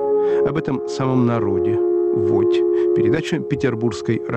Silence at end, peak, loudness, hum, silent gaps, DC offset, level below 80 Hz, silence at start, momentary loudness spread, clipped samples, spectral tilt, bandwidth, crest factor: 0 s; -8 dBFS; -19 LUFS; none; none; under 0.1%; -52 dBFS; 0 s; 5 LU; under 0.1%; -7.5 dB/octave; 8.6 kHz; 10 dB